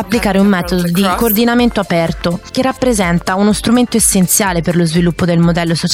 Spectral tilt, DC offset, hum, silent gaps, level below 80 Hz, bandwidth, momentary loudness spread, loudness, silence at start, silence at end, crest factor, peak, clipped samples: -4.5 dB/octave; under 0.1%; none; none; -32 dBFS; 16.5 kHz; 5 LU; -12 LUFS; 0 s; 0 s; 10 dB; -2 dBFS; under 0.1%